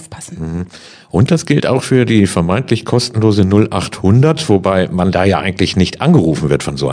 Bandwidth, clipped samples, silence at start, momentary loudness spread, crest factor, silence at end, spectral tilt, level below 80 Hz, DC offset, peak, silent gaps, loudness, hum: 10 kHz; 0.3%; 0 s; 11 LU; 12 dB; 0 s; -6.5 dB/octave; -38 dBFS; under 0.1%; 0 dBFS; none; -13 LUFS; none